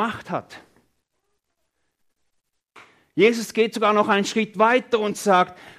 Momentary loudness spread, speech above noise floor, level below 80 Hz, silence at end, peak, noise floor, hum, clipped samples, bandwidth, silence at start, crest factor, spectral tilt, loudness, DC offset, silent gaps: 12 LU; 53 dB; -70 dBFS; 0.1 s; -4 dBFS; -74 dBFS; none; under 0.1%; 15 kHz; 0 s; 18 dB; -4.5 dB/octave; -20 LUFS; under 0.1%; none